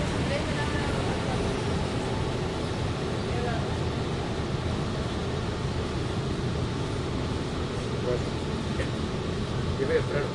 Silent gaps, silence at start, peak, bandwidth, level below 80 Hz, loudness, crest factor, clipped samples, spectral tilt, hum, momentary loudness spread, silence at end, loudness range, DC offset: none; 0 s; -12 dBFS; 11.5 kHz; -40 dBFS; -29 LUFS; 16 dB; under 0.1%; -6 dB/octave; none; 3 LU; 0 s; 1 LU; under 0.1%